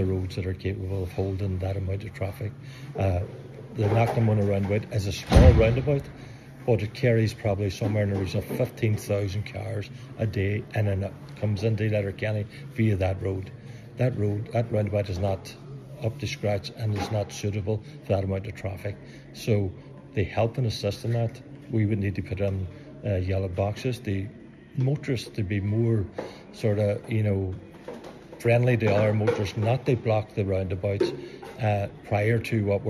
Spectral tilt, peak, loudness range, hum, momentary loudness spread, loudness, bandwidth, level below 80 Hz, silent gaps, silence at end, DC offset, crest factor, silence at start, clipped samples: -7.5 dB/octave; -2 dBFS; 7 LU; none; 14 LU; -27 LUFS; 13.5 kHz; -38 dBFS; none; 0 s; under 0.1%; 24 dB; 0 s; under 0.1%